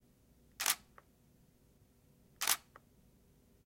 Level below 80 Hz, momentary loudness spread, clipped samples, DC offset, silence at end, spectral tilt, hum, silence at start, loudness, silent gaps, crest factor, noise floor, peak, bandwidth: -72 dBFS; 3 LU; under 0.1%; under 0.1%; 1.1 s; 1.5 dB/octave; none; 0.6 s; -36 LUFS; none; 30 dB; -68 dBFS; -14 dBFS; 16.5 kHz